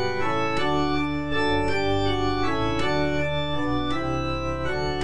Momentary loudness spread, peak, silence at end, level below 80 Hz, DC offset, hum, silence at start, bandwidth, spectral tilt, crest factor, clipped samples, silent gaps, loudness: 3 LU; -12 dBFS; 0 s; -40 dBFS; 3%; none; 0 s; 10.5 kHz; -6 dB/octave; 12 dB; under 0.1%; none; -25 LUFS